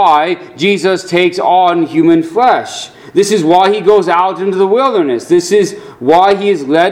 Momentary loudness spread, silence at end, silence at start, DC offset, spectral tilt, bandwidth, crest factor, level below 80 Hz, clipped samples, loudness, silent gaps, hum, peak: 6 LU; 0 s; 0 s; under 0.1%; -5 dB/octave; 14.5 kHz; 10 dB; -56 dBFS; 0.3%; -11 LUFS; none; none; 0 dBFS